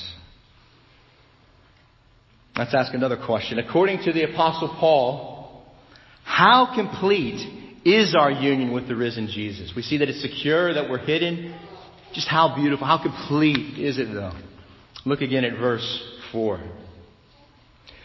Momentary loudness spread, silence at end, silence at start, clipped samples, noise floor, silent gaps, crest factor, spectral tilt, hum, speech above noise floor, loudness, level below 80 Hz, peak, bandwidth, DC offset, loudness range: 16 LU; 1 s; 0 s; under 0.1%; -56 dBFS; none; 22 dB; -6 dB/octave; none; 35 dB; -22 LUFS; -54 dBFS; -2 dBFS; 6.2 kHz; under 0.1%; 8 LU